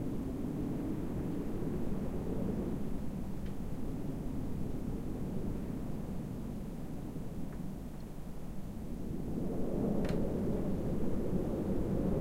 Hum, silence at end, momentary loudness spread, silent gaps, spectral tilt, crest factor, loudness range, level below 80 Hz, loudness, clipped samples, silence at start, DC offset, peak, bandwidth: none; 0 s; 8 LU; none; -8.5 dB/octave; 14 dB; 6 LU; -44 dBFS; -39 LUFS; under 0.1%; 0 s; under 0.1%; -20 dBFS; 16 kHz